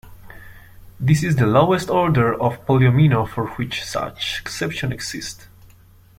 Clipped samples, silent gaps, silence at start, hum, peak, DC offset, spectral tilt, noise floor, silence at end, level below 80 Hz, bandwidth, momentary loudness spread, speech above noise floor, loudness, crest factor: under 0.1%; none; 0.05 s; none; -2 dBFS; under 0.1%; -6 dB/octave; -49 dBFS; 0.75 s; -44 dBFS; 15.5 kHz; 11 LU; 30 dB; -19 LUFS; 18 dB